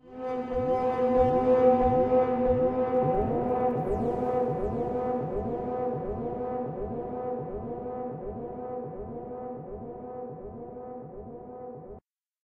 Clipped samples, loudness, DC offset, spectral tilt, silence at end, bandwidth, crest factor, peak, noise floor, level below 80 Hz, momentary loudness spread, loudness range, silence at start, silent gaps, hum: under 0.1%; -28 LUFS; under 0.1%; -10 dB/octave; 0.45 s; 4.9 kHz; 18 dB; -10 dBFS; -54 dBFS; -46 dBFS; 18 LU; 15 LU; 0.05 s; none; none